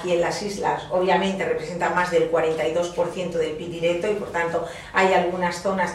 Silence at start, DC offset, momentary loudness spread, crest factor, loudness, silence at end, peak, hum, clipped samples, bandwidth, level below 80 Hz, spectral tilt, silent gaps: 0 s; under 0.1%; 6 LU; 18 dB; -23 LUFS; 0 s; -4 dBFS; 50 Hz at -55 dBFS; under 0.1%; 13 kHz; -52 dBFS; -5 dB/octave; none